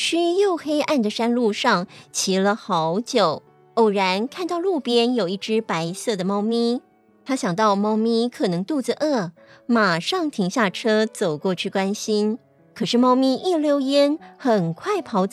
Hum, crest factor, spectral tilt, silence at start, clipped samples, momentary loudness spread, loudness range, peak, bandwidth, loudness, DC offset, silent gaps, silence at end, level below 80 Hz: none; 16 dB; -4.5 dB/octave; 0 s; under 0.1%; 7 LU; 2 LU; -6 dBFS; 14 kHz; -21 LUFS; under 0.1%; none; 0.05 s; -76 dBFS